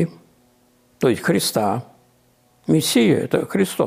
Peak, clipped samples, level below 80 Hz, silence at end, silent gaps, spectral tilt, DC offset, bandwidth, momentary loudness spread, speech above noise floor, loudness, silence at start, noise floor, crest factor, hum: -6 dBFS; under 0.1%; -62 dBFS; 0 s; none; -5 dB/octave; under 0.1%; 15.5 kHz; 9 LU; 40 dB; -19 LUFS; 0 s; -58 dBFS; 16 dB; none